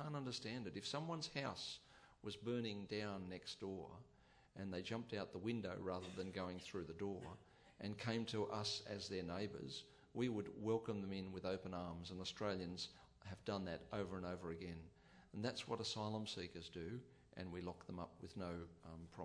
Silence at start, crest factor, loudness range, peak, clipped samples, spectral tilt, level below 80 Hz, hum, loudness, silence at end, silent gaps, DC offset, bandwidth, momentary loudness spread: 0 s; 20 dB; 3 LU; -28 dBFS; under 0.1%; -5 dB/octave; -72 dBFS; none; -48 LUFS; 0 s; none; under 0.1%; 11 kHz; 11 LU